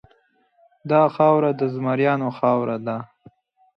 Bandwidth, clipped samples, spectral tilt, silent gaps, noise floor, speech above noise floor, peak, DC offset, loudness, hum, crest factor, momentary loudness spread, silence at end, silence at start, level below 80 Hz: 6 kHz; under 0.1%; -9.5 dB/octave; none; -62 dBFS; 42 dB; -4 dBFS; under 0.1%; -20 LUFS; none; 18 dB; 12 LU; 0.7 s; 0.85 s; -68 dBFS